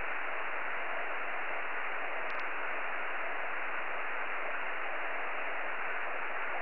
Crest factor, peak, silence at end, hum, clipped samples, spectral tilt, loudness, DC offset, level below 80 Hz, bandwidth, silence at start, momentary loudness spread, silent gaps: 12 dB; -22 dBFS; 0 s; none; under 0.1%; -0.5 dB/octave; -36 LUFS; 2%; -80 dBFS; 5 kHz; 0 s; 0 LU; none